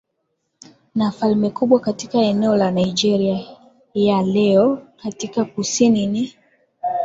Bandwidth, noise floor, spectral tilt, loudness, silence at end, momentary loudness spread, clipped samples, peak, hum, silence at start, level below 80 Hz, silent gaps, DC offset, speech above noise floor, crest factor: 7.8 kHz; -72 dBFS; -5.5 dB/octave; -19 LUFS; 0 s; 11 LU; under 0.1%; -2 dBFS; none; 0.95 s; -58 dBFS; none; under 0.1%; 55 dB; 16 dB